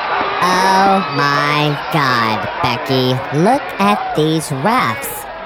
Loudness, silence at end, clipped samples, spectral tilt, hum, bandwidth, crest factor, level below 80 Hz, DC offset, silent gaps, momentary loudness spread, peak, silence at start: -15 LUFS; 0 s; under 0.1%; -5 dB/octave; none; 19 kHz; 14 dB; -48 dBFS; under 0.1%; none; 5 LU; -2 dBFS; 0 s